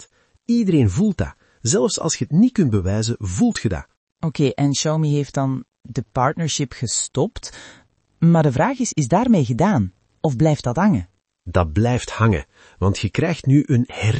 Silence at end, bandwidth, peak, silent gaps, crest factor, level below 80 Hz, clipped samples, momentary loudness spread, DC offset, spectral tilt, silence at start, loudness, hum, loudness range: 0 s; 8.8 kHz; -2 dBFS; 3.97-4.07 s; 16 dB; -44 dBFS; under 0.1%; 10 LU; under 0.1%; -6 dB/octave; 0 s; -20 LUFS; none; 3 LU